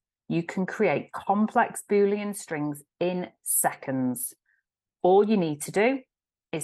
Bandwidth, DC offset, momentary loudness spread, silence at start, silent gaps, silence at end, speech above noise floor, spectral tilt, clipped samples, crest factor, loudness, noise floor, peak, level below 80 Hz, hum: 13 kHz; under 0.1%; 10 LU; 0.3 s; none; 0 s; 51 dB; -5 dB/octave; under 0.1%; 16 dB; -26 LUFS; -77 dBFS; -10 dBFS; -74 dBFS; none